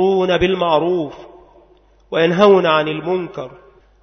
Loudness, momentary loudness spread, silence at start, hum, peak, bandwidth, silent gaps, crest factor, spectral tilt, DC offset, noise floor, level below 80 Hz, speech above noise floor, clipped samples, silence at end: -16 LUFS; 17 LU; 0 s; none; 0 dBFS; 6.4 kHz; none; 16 dB; -6.5 dB/octave; under 0.1%; -51 dBFS; -44 dBFS; 36 dB; under 0.1%; 0.5 s